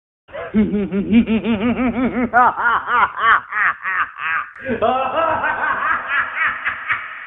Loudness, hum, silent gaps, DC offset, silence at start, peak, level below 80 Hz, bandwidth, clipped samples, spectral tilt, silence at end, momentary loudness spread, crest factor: -18 LUFS; none; none; under 0.1%; 0.3 s; 0 dBFS; -46 dBFS; 3.9 kHz; under 0.1%; -9 dB/octave; 0 s; 7 LU; 18 dB